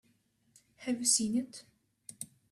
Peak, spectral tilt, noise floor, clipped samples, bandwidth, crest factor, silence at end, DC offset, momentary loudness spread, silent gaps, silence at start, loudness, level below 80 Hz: -14 dBFS; -2 dB/octave; -72 dBFS; under 0.1%; 15 kHz; 24 dB; 0.25 s; under 0.1%; 24 LU; none; 0.8 s; -31 LUFS; -74 dBFS